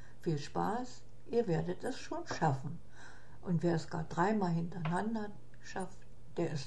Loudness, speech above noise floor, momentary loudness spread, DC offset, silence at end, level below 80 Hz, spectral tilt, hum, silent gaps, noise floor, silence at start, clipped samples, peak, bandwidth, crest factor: -37 LUFS; 20 dB; 15 LU; 0.8%; 0 s; -62 dBFS; -7 dB/octave; none; none; -55 dBFS; 0 s; under 0.1%; -18 dBFS; 12 kHz; 18 dB